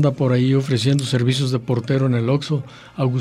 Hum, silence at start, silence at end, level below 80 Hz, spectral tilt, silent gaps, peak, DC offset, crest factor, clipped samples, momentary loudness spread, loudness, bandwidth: none; 0 s; 0 s; -56 dBFS; -6.5 dB/octave; none; -6 dBFS; under 0.1%; 14 dB; under 0.1%; 7 LU; -19 LUFS; 11.5 kHz